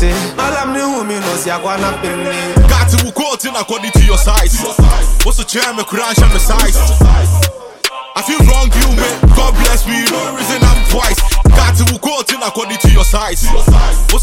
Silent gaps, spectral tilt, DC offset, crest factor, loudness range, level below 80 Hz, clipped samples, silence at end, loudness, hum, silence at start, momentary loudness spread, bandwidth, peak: none; -4 dB/octave; under 0.1%; 10 dB; 2 LU; -12 dBFS; under 0.1%; 0 s; -12 LUFS; none; 0 s; 7 LU; 17 kHz; 0 dBFS